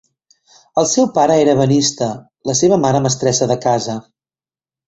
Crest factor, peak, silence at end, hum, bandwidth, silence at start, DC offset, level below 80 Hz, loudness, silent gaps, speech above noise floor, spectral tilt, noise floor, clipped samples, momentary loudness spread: 16 dB; 0 dBFS; 0.85 s; none; 8.2 kHz; 0.75 s; under 0.1%; -52 dBFS; -15 LUFS; none; over 75 dB; -4.5 dB/octave; under -90 dBFS; under 0.1%; 10 LU